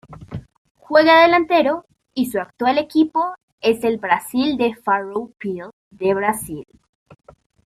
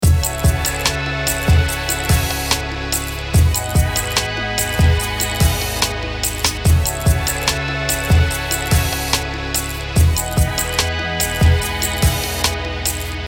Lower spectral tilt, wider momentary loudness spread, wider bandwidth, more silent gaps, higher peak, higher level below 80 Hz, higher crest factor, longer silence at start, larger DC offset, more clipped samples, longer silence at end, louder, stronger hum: about the same, -4.5 dB/octave vs -3.5 dB/octave; first, 19 LU vs 5 LU; second, 15 kHz vs 19.5 kHz; first, 0.58-0.65 s, 0.71-0.75 s, 3.43-3.58 s, 5.73-5.91 s vs none; about the same, -2 dBFS vs 0 dBFS; second, -56 dBFS vs -22 dBFS; about the same, 18 dB vs 16 dB; about the same, 0.1 s vs 0 s; neither; neither; first, 1.05 s vs 0 s; about the same, -18 LUFS vs -18 LUFS; neither